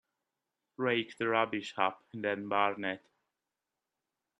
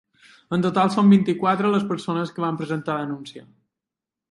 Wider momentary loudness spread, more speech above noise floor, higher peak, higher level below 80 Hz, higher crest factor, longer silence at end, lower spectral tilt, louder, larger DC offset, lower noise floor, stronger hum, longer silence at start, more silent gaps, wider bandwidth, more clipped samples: second, 7 LU vs 11 LU; second, 56 dB vs 67 dB; second, -12 dBFS vs -6 dBFS; second, -82 dBFS vs -66 dBFS; first, 24 dB vs 16 dB; first, 1.4 s vs 0.9 s; second, -5.5 dB/octave vs -7.5 dB/octave; second, -33 LUFS vs -21 LUFS; neither; about the same, -89 dBFS vs -87 dBFS; neither; first, 0.8 s vs 0.5 s; neither; about the same, 11.5 kHz vs 11 kHz; neither